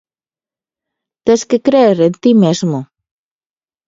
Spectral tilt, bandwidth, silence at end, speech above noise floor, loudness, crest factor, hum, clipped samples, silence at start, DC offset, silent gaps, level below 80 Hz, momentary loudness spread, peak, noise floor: -6.5 dB/octave; 7.8 kHz; 1.05 s; over 79 dB; -12 LUFS; 14 dB; none; under 0.1%; 1.25 s; under 0.1%; none; -58 dBFS; 9 LU; 0 dBFS; under -90 dBFS